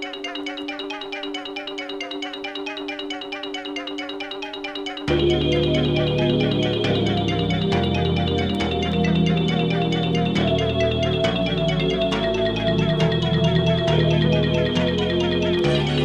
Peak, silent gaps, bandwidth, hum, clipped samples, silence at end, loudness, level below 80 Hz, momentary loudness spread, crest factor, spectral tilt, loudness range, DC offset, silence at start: -6 dBFS; none; 8.8 kHz; none; under 0.1%; 0 s; -22 LUFS; -38 dBFS; 10 LU; 16 dB; -6.5 dB/octave; 9 LU; under 0.1%; 0 s